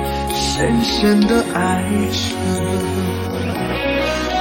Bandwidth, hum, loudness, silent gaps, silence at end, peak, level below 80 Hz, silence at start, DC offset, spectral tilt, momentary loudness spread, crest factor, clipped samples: 17 kHz; none; -18 LUFS; none; 0 s; -4 dBFS; -32 dBFS; 0 s; under 0.1%; -5 dB/octave; 6 LU; 14 dB; under 0.1%